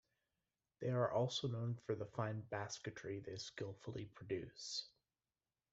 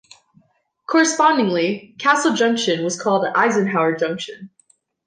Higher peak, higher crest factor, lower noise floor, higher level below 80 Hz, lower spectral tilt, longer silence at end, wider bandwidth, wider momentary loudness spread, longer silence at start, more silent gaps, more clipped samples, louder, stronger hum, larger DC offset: second, -24 dBFS vs -4 dBFS; about the same, 20 dB vs 16 dB; first, under -90 dBFS vs -62 dBFS; second, -76 dBFS vs -70 dBFS; first, -5 dB/octave vs -3.5 dB/octave; first, 0.85 s vs 0.6 s; second, 8 kHz vs 10 kHz; first, 11 LU vs 8 LU; about the same, 0.8 s vs 0.9 s; neither; neither; second, -44 LUFS vs -18 LUFS; neither; neither